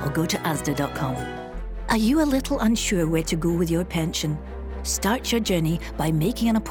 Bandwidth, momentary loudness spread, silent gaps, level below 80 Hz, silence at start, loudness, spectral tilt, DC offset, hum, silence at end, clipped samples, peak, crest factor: 18.5 kHz; 10 LU; none; -36 dBFS; 0 s; -24 LUFS; -5 dB/octave; under 0.1%; none; 0 s; under 0.1%; -10 dBFS; 14 dB